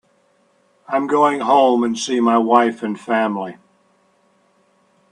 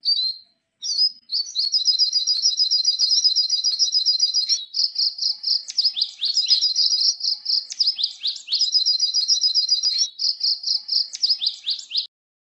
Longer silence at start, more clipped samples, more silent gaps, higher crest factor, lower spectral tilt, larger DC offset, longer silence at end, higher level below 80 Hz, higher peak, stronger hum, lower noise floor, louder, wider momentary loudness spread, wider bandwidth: first, 0.9 s vs 0.05 s; neither; neither; about the same, 18 dB vs 16 dB; first, -4.5 dB/octave vs 6.5 dB/octave; neither; first, 1.6 s vs 0.45 s; first, -70 dBFS vs -88 dBFS; first, 0 dBFS vs -6 dBFS; neither; first, -59 dBFS vs -48 dBFS; about the same, -17 LUFS vs -18 LUFS; first, 10 LU vs 7 LU; about the same, 10.5 kHz vs 10.5 kHz